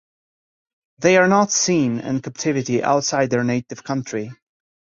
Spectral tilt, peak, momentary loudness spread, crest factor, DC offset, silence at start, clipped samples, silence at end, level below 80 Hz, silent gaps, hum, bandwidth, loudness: -4 dB/octave; -2 dBFS; 12 LU; 18 dB; under 0.1%; 1 s; under 0.1%; 0.6 s; -60 dBFS; none; none; 7.6 kHz; -19 LUFS